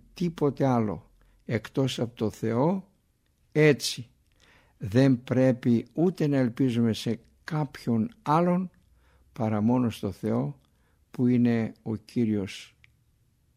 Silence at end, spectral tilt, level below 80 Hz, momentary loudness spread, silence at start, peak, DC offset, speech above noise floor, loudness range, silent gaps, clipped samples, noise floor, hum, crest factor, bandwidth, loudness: 0.9 s; -7 dB/octave; -62 dBFS; 12 LU; 0.15 s; -8 dBFS; under 0.1%; 43 dB; 3 LU; none; under 0.1%; -68 dBFS; none; 18 dB; 15 kHz; -27 LUFS